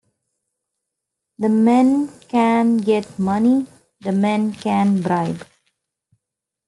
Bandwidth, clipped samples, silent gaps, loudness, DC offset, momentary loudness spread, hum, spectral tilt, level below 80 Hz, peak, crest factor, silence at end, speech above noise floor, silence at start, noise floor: 11.5 kHz; under 0.1%; none; -18 LUFS; under 0.1%; 9 LU; none; -7.5 dB/octave; -62 dBFS; -4 dBFS; 16 dB; 1.25 s; 66 dB; 1.4 s; -83 dBFS